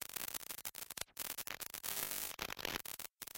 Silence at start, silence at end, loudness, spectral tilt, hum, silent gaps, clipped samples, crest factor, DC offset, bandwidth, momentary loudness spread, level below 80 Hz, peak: 0 s; 0 s; -43 LUFS; -0.5 dB/octave; none; none; under 0.1%; 28 dB; under 0.1%; 17 kHz; 6 LU; -68 dBFS; -18 dBFS